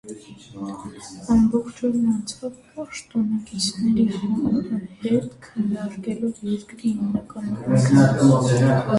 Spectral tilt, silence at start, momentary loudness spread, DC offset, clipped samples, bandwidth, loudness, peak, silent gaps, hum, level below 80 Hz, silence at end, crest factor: -6.5 dB/octave; 0.05 s; 18 LU; under 0.1%; under 0.1%; 11.5 kHz; -21 LUFS; -4 dBFS; none; none; -50 dBFS; 0 s; 18 dB